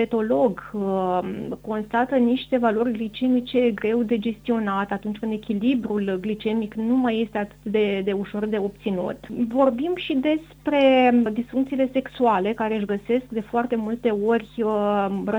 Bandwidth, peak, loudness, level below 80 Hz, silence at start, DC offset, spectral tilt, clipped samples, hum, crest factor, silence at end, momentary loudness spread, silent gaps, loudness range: 7.8 kHz; -6 dBFS; -23 LUFS; -54 dBFS; 0 s; under 0.1%; -7.5 dB/octave; under 0.1%; none; 16 dB; 0 s; 6 LU; none; 3 LU